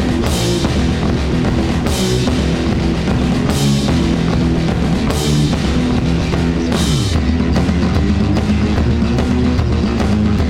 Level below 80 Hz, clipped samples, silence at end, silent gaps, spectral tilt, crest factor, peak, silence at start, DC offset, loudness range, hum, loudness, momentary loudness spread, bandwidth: -22 dBFS; under 0.1%; 0 s; none; -6 dB/octave; 14 dB; 0 dBFS; 0 s; under 0.1%; 1 LU; none; -15 LUFS; 2 LU; 16 kHz